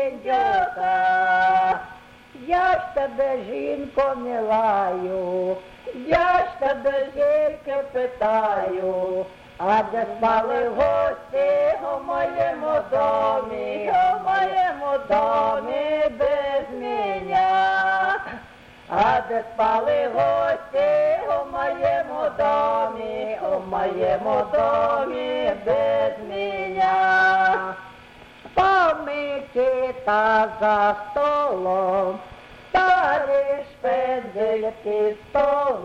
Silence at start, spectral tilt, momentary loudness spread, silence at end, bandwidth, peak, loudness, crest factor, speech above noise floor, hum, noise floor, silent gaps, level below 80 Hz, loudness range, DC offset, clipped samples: 0 s; -5.5 dB/octave; 8 LU; 0 s; 8.2 kHz; -8 dBFS; -22 LUFS; 14 dB; 24 dB; none; -45 dBFS; none; -52 dBFS; 2 LU; under 0.1%; under 0.1%